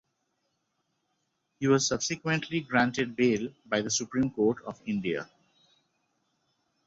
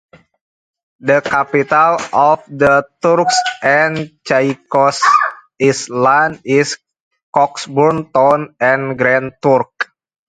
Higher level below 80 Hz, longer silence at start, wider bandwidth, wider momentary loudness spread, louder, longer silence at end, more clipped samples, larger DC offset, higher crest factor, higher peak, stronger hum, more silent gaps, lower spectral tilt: second, -64 dBFS vs -56 dBFS; first, 1.6 s vs 1.05 s; second, 8.2 kHz vs 9.6 kHz; first, 8 LU vs 5 LU; second, -29 LUFS vs -14 LUFS; first, 1.6 s vs 0.45 s; neither; neither; first, 20 dB vs 14 dB; second, -12 dBFS vs 0 dBFS; neither; second, none vs 7.00-7.11 s, 7.23-7.33 s; about the same, -4 dB/octave vs -4.5 dB/octave